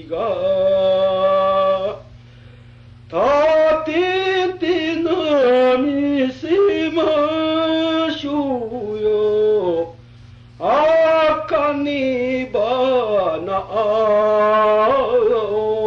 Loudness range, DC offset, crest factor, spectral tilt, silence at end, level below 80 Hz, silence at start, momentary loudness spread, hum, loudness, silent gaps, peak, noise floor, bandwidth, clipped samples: 2 LU; under 0.1%; 10 dB; -6 dB/octave; 0 s; -50 dBFS; 0 s; 7 LU; 60 Hz at -45 dBFS; -17 LUFS; none; -8 dBFS; -42 dBFS; 7.2 kHz; under 0.1%